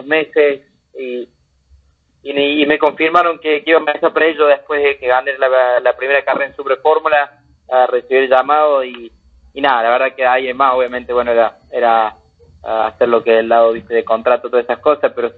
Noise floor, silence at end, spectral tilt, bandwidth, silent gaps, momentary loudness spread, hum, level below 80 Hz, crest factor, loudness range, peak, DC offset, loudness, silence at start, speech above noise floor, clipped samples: -53 dBFS; 0.05 s; -6 dB/octave; 4.7 kHz; none; 9 LU; none; -54 dBFS; 14 dB; 2 LU; 0 dBFS; under 0.1%; -14 LUFS; 0 s; 39 dB; under 0.1%